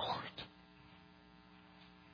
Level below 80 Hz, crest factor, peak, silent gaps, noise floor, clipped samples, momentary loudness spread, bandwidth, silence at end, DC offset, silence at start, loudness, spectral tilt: -72 dBFS; 22 dB; -28 dBFS; none; -62 dBFS; under 0.1%; 19 LU; 5.4 kHz; 0 s; under 0.1%; 0 s; -48 LUFS; -1.5 dB/octave